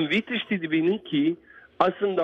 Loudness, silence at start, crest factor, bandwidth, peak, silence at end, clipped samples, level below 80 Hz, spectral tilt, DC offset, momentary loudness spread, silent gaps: -25 LUFS; 0 s; 20 dB; 7.8 kHz; -6 dBFS; 0 s; under 0.1%; -66 dBFS; -7 dB/octave; under 0.1%; 4 LU; none